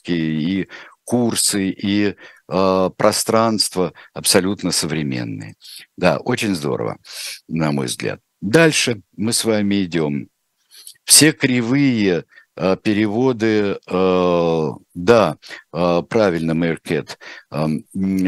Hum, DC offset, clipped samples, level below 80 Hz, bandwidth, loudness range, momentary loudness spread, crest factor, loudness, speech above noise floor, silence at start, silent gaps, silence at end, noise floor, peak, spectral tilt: none; under 0.1%; under 0.1%; -54 dBFS; 16 kHz; 4 LU; 14 LU; 18 dB; -18 LUFS; 31 dB; 0.05 s; none; 0 s; -50 dBFS; 0 dBFS; -4 dB/octave